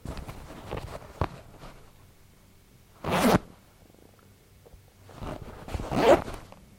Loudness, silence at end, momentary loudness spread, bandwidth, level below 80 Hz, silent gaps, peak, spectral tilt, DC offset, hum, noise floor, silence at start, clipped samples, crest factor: -28 LUFS; 0.3 s; 25 LU; 16.5 kHz; -46 dBFS; none; -6 dBFS; -5.5 dB/octave; under 0.1%; none; -56 dBFS; 0.05 s; under 0.1%; 24 dB